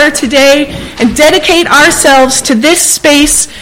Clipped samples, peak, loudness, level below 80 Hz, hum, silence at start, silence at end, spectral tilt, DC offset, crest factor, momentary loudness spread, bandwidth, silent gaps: 1%; 0 dBFS; -6 LUFS; -30 dBFS; none; 0 s; 0 s; -1.5 dB/octave; under 0.1%; 6 dB; 5 LU; over 20 kHz; none